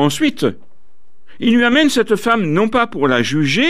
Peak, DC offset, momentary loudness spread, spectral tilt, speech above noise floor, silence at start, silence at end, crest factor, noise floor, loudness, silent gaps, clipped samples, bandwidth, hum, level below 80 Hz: -2 dBFS; 3%; 6 LU; -5 dB/octave; 45 dB; 0 s; 0 s; 14 dB; -59 dBFS; -15 LUFS; none; under 0.1%; 15.5 kHz; none; -50 dBFS